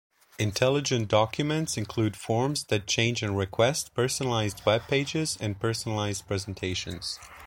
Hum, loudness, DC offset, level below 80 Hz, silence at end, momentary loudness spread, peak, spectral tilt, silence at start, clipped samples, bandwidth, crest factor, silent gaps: none; -28 LUFS; under 0.1%; -56 dBFS; 0 s; 7 LU; -8 dBFS; -4.5 dB/octave; 0.4 s; under 0.1%; 17 kHz; 20 dB; none